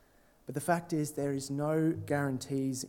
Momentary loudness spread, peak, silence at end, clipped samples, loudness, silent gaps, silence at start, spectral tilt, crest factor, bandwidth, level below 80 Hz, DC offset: 6 LU; -14 dBFS; 0 s; under 0.1%; -33 LUFS; none; 0.5 s; -6 dB/octave; 18 dB; 17.5 kHz; -70 dBFS; under 0.1%